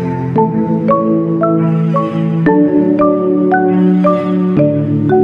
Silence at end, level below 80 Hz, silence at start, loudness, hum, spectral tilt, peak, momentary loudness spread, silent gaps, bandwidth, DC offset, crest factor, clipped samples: 0 s; -48 dBFS; 0 s; -12 LUFS; none; -11 dB/octave; 0 dBFS; 3 LU; none; 5.2 kHz; under 0.1%; 10 dB; under 0.1%